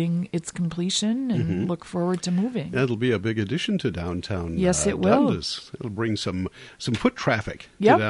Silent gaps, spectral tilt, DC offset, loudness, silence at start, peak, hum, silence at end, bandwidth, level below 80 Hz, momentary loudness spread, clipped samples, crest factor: none; -5 dB/octave; under 0.1%; -25 LUFS; 0 s; -4 dBFS; none; 0 s; 11.5 kHz; -46 dBFS; 10 LU; under 0.1%; 20 dB